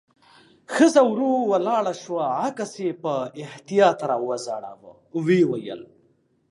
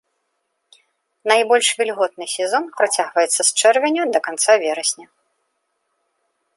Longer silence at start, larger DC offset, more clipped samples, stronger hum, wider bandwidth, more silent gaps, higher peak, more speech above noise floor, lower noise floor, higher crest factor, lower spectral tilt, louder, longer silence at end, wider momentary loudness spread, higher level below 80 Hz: second, 0.7 s vs 1.25 s; neither; neither; neither; about the same, 11.5 kHz vs 12 kHz; neither; about the same, -4 dBFS vs -2 dBFS; second, 41 dB vs 55 dB; second, -64 dBFS vs -72 dBFS; about the same, 20 dB vs 18 dB; first, -5.5 dB/octave vs 0.5 dB/octave; second, -22 LUFS vs -17 LUFS; second, 0.65 s vs 1.55 s; first, 15 LU vs 8 LU; about the same, -76 dBFS vs -78 dBFS